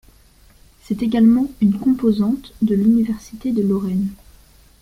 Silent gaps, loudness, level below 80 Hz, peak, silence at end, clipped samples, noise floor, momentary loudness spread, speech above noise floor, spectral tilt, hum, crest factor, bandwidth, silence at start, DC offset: none; -18 LUFS; -46 dBFS; -4 dBFS; 0.7 s; under 0.1%; -50 dBFS; 9 LU; 33 dB; -8.5 dB/octave; none; 14 dB; 14.5 kHz; 0.9 s; under 0.1%